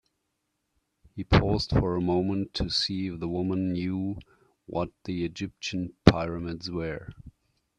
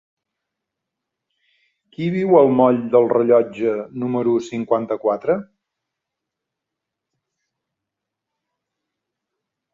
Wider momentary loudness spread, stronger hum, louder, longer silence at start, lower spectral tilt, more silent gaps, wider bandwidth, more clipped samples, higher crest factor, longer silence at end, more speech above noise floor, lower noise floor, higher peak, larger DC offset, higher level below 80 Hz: first, 13 LU vs 10 LU; neither; second, -28 LUFS vs -18 LUFS; second, 1.15 s vs 2 s; second, -6.5 dB/octave vs -8.5 dB/octave; neither; first, 10.5 kHz vs 7.4 kHz; neither; first, 28 dB vs 20 dB; second, 0.5 s vs 4.3 s; second, 52 dB vs 66 dB; second, -79 dBFS vs -83 dBFS; about the same, 0 dBFS vs -2 dBFS; neither; first, -42 dBFS vs -66 dBFS